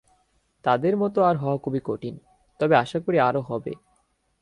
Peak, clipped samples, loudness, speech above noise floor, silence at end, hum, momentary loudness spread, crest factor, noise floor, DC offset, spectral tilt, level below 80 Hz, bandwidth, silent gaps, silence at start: -6 dBFS; under 0.1%; -24 LUFS; 45 dB; 0.65 s; none; 12 LU; 18 dB; -68 dBFS; under 0.1%; -8 dB/octave; -62 dBFS; 11 kHz; none; 0.65 s